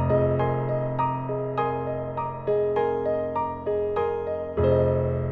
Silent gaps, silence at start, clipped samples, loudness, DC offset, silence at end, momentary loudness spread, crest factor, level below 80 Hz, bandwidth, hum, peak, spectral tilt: none; 0 s; under 0.1%; -26 LUFS; under 0.1%; 0 s; 7 LU; 14 dB; -46 dBFS; 4.5 kHz; none; -10 dBFS; -10.5 dB/octave